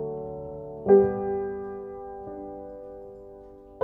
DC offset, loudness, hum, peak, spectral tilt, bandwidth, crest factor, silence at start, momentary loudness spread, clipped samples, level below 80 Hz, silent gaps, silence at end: under 0.1%; -26 LUFS; none; -8 dBFS; -12 dB/octave; 2.6 kHz; 20 dB; 0 s; 25 LU; under 0.1%; -54 dBFS; none; 0 s